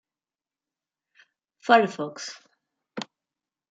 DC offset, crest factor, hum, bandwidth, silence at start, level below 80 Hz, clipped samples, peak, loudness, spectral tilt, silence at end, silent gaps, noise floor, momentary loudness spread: under 0.1%; 26 dB; none; 7.8 kHz; 1.65 s; -84 dBFS; under 0.1%; -4 dBFS; -23 LUFS; -4 dB/octave; 0.7 s; none; under -90 dBFS; 21 LU